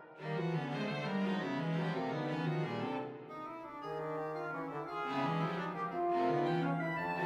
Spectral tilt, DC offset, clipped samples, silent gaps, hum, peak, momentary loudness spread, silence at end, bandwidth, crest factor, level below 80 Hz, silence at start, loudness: -7.5 dB/octave; under 0.1%; under 0.1%; none; none; -22 dBFS; 9 LU; 0 s; 8.4 kHz; 14 dB; -76 dBFS; 0 s; -37 LUFS